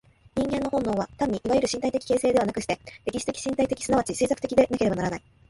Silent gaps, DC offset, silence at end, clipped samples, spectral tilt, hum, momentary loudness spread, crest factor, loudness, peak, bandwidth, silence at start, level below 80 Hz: none; under 0.1%; 0.3 s; under 0.1%; -5 dB/octave; none; 8 LU; 20 dB; -26 LUFS; -6 dBFS; 11.5 kHz; 0.35 s; -50 dBFS